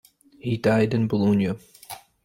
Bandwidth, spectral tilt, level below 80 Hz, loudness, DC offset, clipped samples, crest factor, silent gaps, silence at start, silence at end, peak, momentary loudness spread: 16.5 kHz; -7.5 dB/octave; -58 dBFS; -23 LUFS; under 0.1%; under 0.1%; 16 dB; none; 0.45 s; 0.3 s; -8 dBFS; 19 LU